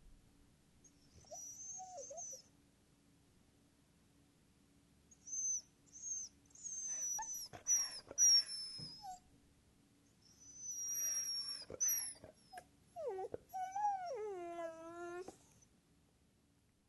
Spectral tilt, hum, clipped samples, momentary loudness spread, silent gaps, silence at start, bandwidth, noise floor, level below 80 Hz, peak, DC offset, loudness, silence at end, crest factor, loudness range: 0.5 dB/octave; none; under 0.1%; 20 LU; none; 0.05 s; 12 kHz; -75 dBFS; -76 dBFS; -24 dBFS; under 0.1%; -39 LUFS; 1.5 s; 20 dB; 17 LU